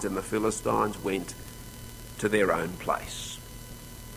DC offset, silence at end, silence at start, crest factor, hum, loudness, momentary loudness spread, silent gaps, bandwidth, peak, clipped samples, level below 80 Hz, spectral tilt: under 0.1%; 0 s; 0 s; 20 dB; none; -29 LUFS; 18 LU; none; 16 kHz; -10 dBFS; under 0.1%; -48 dBFS; -4.5 dB/octave